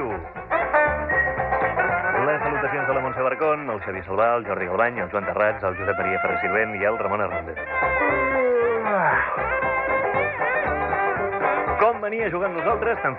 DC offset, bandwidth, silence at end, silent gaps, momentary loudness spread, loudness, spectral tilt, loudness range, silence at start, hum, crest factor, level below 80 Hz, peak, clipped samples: under 0.1%; 5 kHz; 0 s; none; 5 LU; -22 LUFS; -9.5 dB/octave; 2 LU; 0 s; none; 16 dB; -46 dBFS; -6 dBFS; under 0.1%